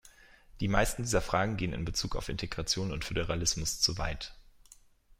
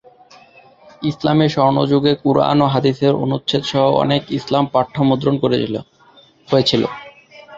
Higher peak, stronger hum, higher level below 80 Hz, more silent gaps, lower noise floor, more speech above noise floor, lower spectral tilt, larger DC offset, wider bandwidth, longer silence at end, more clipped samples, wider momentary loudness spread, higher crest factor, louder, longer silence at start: second, -10 dBFS vs 0 dBFS; neither; first, -42 dBFS vs -52 dBFS; neither; first, -59 dBFS vs -49 dBFS; second, 28 dB vs 33 dB; second, -3.5 dB/octave vs -7 dB/octave; neither; first, 16 kHz vs 7.8 kHz; first, 0.8 s vs 0 s; neither; about the same, 8 LU vs 7 LU; first, 22 dB vs 16 dB; second, -32 LUFS vs -16 LUFS; second, 0.05 s vs 1 s